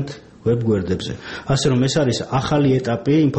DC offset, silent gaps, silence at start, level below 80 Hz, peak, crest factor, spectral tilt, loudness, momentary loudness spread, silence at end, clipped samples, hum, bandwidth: under 0.1%; none; 0 s; -44 dBFS; -6 dBFS; 12 dB; -6 dB/octave; -19 LUFS; 9 LU; 0 s; under 0.1%; none; 8.6 kHz